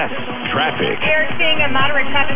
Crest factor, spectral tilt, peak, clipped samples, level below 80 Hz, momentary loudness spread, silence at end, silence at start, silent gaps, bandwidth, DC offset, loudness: 12 dB; -7.5 dB/octave; -2 dBFS; under 0.1%; -44 dBFS; 6 LU; 0 s; 0 s; none; 3.8 kHz; under 0.1%; -16 LUFS